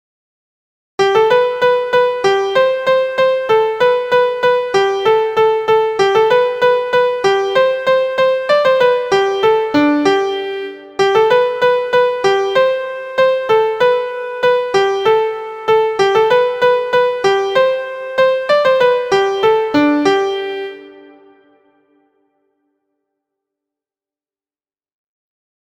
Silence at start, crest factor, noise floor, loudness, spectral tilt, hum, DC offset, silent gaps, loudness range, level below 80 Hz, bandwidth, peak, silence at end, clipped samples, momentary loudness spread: 1 s; 14 dB; under -90 dBFS; -14 LUFS; -4 dB/octave; none; under 0.1%; none; 2 LU; -56 dBFS; 9.4 kHz; 0 dBFS; 4.65 s; under 0.1%; 5 LU